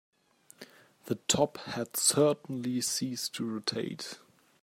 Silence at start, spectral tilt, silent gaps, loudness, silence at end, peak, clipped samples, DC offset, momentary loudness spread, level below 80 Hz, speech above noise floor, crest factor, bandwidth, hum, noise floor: 0.6 s; -3 dB/octave; none; -30 LUFS; 0.45 s; -10 dBFS; under 0.1%; under 0.1%; 14 LU; -70 dBFS; 31 dB; 22 dB; 16 kHz; none; -62 dBFS